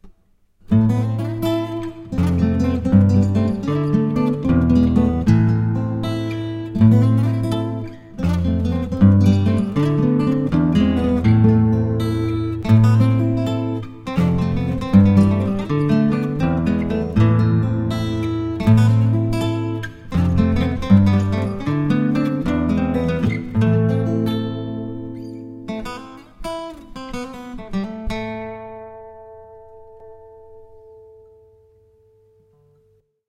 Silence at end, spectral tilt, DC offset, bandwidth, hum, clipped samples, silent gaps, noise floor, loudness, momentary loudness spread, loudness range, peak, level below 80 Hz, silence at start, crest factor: 2.65 s; -9 dB/octave; under 0.1%; 9.8 kHz; none; under 0.1%; none; -60 dBFS; -18 LUFS; 15 LU; 13 LU; 0 dBFS; -36 dBFS; 0.05 s; 18 dB